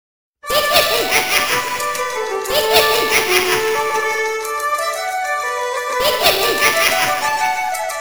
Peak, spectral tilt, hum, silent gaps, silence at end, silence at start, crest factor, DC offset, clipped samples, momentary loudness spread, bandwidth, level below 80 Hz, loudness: 0 dBFS; -0.5 dB/octave; none; none; 0 s; 0.45 s; 18 dB; 0.8%; under 0.1%; 8 LU; over 20 kHz; -48 dBFS; -16 LUFS